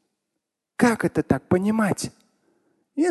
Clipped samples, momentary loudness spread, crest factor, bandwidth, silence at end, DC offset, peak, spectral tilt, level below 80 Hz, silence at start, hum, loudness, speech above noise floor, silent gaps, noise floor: under 0.1%; 14 LU; 20 dB; 12.5 kHz; 0 s; under 0.1%; -4 dBFS; -6 dB/octave; -52 dBFS; 0.8 s; none; -23 LUFS; 60 dB; none; -82 dBFS